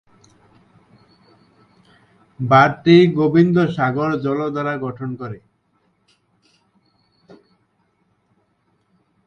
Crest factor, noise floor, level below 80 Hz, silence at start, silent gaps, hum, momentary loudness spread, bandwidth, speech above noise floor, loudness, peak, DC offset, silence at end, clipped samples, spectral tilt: 20 dB; -65 dBFS; -58 dBFS; 2.4 s; none; none; 17 LU; 6.8 kHz; 49 dB; -16 LUFS; 0 dBFS; under 0.1%; 3.9 s; under 0.1%; -8 dB/octave